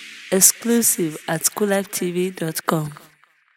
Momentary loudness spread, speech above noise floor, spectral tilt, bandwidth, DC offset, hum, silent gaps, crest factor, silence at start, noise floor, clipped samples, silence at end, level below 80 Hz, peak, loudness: 10 LU; 37 dB; -3 dB/octave; 18.5 kHz; under 0.1%; none; none; 22 dB; 0 s; -57 dBFS; under 0.1%; 0.6 s; -66 dBFS; 0 dBFS; -19 LUFS